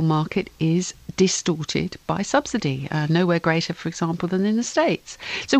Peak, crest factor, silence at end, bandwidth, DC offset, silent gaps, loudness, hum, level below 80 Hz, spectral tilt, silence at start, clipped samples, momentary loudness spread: -4 dBFS; 18 dB; 0 s; 9 kHz; under 0.1%; none; -23 LUFS; none; -52 dBFS; -5 dB/octave; 0 s; under 0.1%; 7 LU